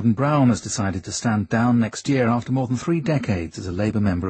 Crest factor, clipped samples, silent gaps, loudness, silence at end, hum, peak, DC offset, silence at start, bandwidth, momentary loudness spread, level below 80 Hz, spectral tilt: 14 dB; under 0.1%; none; -22 LUFS; 0 s; none; -6 dBFS; under 0.1%; 0 s; 8.8 kHz; 6 LU; -48 dBFS; -6 dB/octave